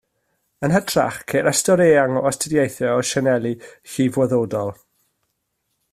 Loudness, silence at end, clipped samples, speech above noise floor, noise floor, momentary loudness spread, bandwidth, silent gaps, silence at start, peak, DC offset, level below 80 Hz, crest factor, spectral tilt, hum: -19 LUFS; 1.2 s; under 0.1%; 55 dB; -73 dBFS; 11 LU; 15.5 kHz; none; 0.6 s; -4 dBFS; under 0.1%; -56 dBFS; 16 dB; -4.5 dB/octave; none